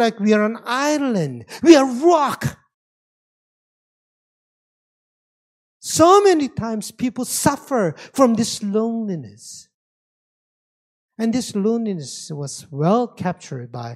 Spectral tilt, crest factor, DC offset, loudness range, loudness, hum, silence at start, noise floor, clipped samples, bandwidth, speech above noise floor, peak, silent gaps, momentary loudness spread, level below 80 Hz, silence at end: -5 dB/octave; 20 dB; under 0.1%; 9 LU; -18 LUFS; none; 0 s; under -90 dBFS; under 0.1%; 15.5 kHz; over 72 dB; 0 dBFS; 2.74-5.80 s, 9.74-11.09 s; 17 LU; -58 dBFS; 0 s